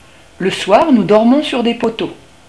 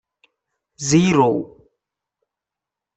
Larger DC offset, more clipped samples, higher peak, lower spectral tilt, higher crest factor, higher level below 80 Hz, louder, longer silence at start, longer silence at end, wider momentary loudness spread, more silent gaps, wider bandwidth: first, 0.4% vs under 0.1%; first, 0.3% vs under 0.1%; first, 0 dBFS vs -4 dBFS; about the same, -5.5 dB/octave vs -5.5 dB/octave; second, 14 dB vs 20 dB; about the same, -50 dBFS vs -54 dBFS; first, -13 LUFS vs -18 LUFS; second, 0.4 s vs 0.8 s; second, 0.35 s vs 1.5 s; second, 11 LU vs 14 LU; neither; first, 11 kHz vs 8.4 kHz